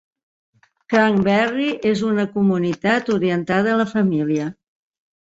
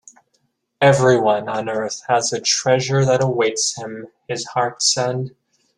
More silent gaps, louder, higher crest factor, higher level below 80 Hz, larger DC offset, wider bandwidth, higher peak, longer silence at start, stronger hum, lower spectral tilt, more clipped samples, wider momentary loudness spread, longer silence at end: neither; about the same, -19 LUFS vs -18 LUFS; about the same, 18 dB vs 18 dB; about the same, -58 dBFS vs -58 dBFS; neither; second, 7.8 kHz vs 11.5 kHz; about the same, -2 dBFS vs -2 dBFS; about the same, 0.9 s vs 0.8 s; neither; first, -7 dB/octave vs -3.5 dB/octave; neither; second, 4 LU vs 13 LU; first, 0.7 s vs 0.5 s